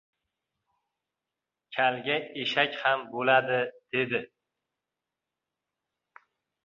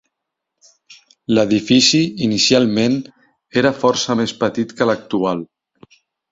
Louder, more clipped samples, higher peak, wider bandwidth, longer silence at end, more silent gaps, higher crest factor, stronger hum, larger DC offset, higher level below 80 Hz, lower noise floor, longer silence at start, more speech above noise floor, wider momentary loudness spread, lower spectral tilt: second, -27 LUFS vs -16 LUFS; neither; second, -8 dBFS vs 0 dBFS; about the same, 7.4 kHz vs 8 kHz; first, 2.4 s vs 0.9 s; neither; first, 24 dB vs 18 dB; neither; neither; second, -78 dBFS vs -56 dBFS; first, -88 dBFS vs -79 dBFS; first, 1.7 s vs 0.9 s; about the same, 61 dB vs 63 dB; about the same, 7 LU vs 9 LU; first, -5.5 dB/octave vs -4 dB/octave